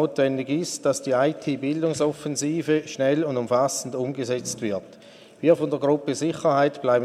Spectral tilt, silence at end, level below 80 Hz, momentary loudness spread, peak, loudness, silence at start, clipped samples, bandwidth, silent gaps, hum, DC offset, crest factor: -5 dB/octave; 0 s; -68 dBFS; 6 LU; -6 dBFS; -24 LUFS; 0 s; under 0.1%; 14.5 kHz; none; none; under 0.1%; 18 dB